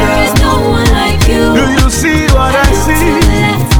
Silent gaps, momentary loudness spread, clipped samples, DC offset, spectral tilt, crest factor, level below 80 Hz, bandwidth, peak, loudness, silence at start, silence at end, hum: none; 1 LU; 0.3%; 6%; -5 dB/octave; 8 dB; -14 dBFS; over 20 kHz; 0 dBFS; -9 LUFS; 0 s; 0 s; none